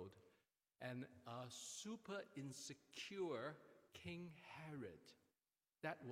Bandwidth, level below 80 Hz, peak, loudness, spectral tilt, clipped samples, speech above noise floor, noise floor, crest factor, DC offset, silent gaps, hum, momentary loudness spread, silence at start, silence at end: 16 kHz; -90 dBFS; -32 dBFS; -53 LUFS; -4 dB/octave; under 0.1%; over 37 dB; under -90 dBFS; 22 dB; under 0.1%; none; none; 10 LU; 0 s; 0 s